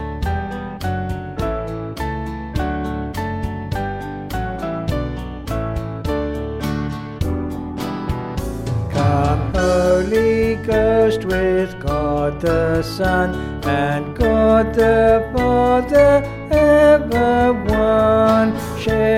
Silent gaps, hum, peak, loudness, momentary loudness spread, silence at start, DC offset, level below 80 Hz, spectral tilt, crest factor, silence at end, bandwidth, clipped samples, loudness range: none; none; -2 dBFS; -18 LUFS; 12 LU; 0 s; under 0.1%; -30 dBFS; -7 dB/octave; 16 dB; 0 s; 16.5 kHz; under 0.1%; 10 LU